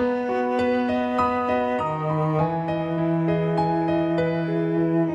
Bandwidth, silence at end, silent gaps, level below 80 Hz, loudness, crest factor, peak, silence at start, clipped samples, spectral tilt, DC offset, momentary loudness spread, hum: 7.8 kHz; 0 s; none; -54 dBFS; -23 LUFS; 12 dB; -10 dBFS; 0 s; under 0.1%; -9 dB/octave; under 0.1%; 2 LU; none